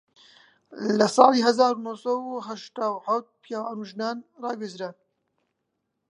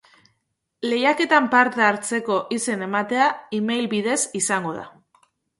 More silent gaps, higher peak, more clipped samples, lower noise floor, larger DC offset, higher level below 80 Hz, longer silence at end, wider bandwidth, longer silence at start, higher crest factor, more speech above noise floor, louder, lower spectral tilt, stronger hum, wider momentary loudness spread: neither; about the same, 0 dBFS vs -2 dBFS; neither; first, -79 dBFS vs -75 dBFS; neither; second, -80 dBFS vs -70 dBFS; first, 1.2 s vs 0.7 s; about the same, 11 kHz vs 11.5 kHz; about the same, 0.7 s vs 0.8 s; first, 26 dB vs 20 dB; about the same, 54 dB vs 54 dB; second, -25 LUFS vs -21 LUFS; first, -4.5 dB/octave vs -3 dB/octave; neither; first, 17 LU vs 9 LU